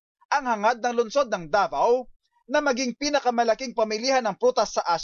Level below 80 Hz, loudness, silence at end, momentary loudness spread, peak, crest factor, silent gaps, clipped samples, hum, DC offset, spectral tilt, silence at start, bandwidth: -60 dBFS; -24 LUFS; 0 s; 4 LU; -10 dBFS; 14 dB; 2.16-2.20 s; under 0.1%; none; under 0.1%; -3 dB/octave; 0.3 s; 7.4 kHz